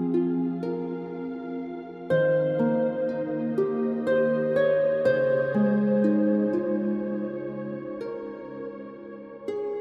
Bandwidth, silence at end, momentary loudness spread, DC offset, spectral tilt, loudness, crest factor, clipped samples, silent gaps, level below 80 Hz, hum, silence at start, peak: 5 kHz; 0 s; 15 LU; under 0.1%; -9.5 dB/octave; -26 LUFS; 14 dB; under 0.1%; none; -68 dBFS; none; 0 s; -12 dBFS